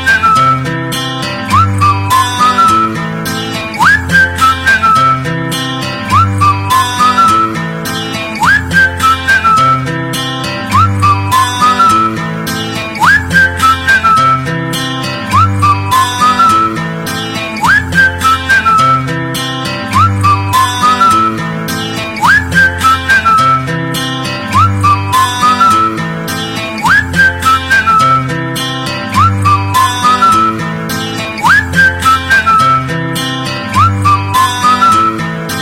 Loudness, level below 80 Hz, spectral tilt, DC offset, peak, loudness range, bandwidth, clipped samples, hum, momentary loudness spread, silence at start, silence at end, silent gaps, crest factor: -9 LUFS; -36 dBFS; -4 dB/octave; under 0.1%; 0 dBFS; 2 LU; 17 kHz; under 0.1%; none; 9 LU; 0 s; 0 s; none; 10 dB